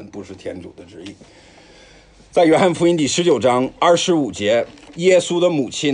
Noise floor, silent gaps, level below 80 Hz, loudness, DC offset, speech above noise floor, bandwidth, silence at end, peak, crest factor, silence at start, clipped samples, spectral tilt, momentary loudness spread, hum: -47 dBFS; none; -54 dBFS; -16 LUFS; under 0.1%; 30 dB; 10.5 kHz; 0 s; -2 dBFS; 16 dB; 0 s; under 0.1%; -4.5 dB/octave; 21 LU; none